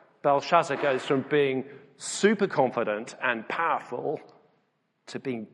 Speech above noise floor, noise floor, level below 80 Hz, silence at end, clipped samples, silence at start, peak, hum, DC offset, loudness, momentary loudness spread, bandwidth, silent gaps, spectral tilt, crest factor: 46 dB; -72 dBFS; -78 dBFS; 0.05 s; under 0.1%; 0.25 s; -6 dBFS; none; under 0.1%; -27 LUFS; 12 LU; 11.5 kHz; none; -4.5 dB/octave; 22 dB